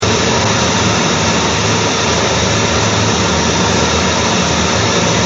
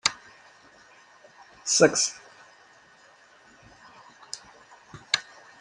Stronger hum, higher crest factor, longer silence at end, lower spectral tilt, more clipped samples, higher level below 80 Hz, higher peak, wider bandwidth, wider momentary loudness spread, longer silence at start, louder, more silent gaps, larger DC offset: neither; second, 12 dB vs 30 dB; second, 0 s vs 0.4 s; first, -3.5 dB/octave vs -1.5 dB/octave; neither; first, -30 dBFS vs -70 dBFS; about the same, 0 dBFS vs -2 dBFS; second, 8.2 kHz vs 11.5 kHz; second, 1 LU vs 28 LU; about the same, 0 s vs 0.05 s; first, -12 LUFS vs -24 LUFS; neither; neither